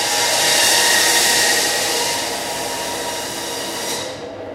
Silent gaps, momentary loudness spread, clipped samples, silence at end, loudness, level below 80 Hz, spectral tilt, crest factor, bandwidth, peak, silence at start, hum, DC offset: none; 12 LU; under 0.1%; 0 s; -16 LUFS; -52 dBFS; 0 dB/octave; 16 dB; 16 kHz; -2 dBFS; 0 s; none; under 0.1%